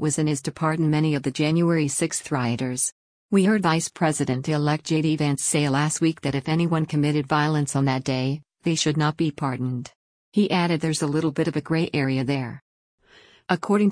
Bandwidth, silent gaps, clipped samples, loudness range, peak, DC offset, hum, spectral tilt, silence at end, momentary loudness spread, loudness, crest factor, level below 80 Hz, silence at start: 10.5 kHz; 2.92-3.29 s, 9.95-10.32 s, 12.62-12.98 s; under 0.1%; 2 LU; -6 dBFS; under 0.1%; none; -5 dB/octave; 0 s; 6 LU; -23 LUFS; 18 dB; -60 dBFS; 0 s